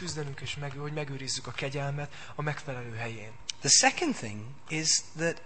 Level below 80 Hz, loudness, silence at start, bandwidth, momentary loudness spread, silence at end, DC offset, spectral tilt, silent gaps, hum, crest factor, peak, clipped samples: -62 dBFS; -29 LUFS; 0 s; 8.8 kHz; 17 LU; 0 s; 0.7%; -2.5 dB/octave; none; none; 24 dB; -8 dBFS; under 0.1%